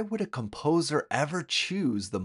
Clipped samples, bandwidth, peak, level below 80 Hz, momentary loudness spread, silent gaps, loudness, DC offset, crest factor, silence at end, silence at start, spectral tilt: under 0.1%; 11.5 kHz; -10 dBFS; -66 dBFS; 6 LU; none; -29 LUFS; under 0.1%; 20 dB; 0 s; 0 s; -4.5 dB/octave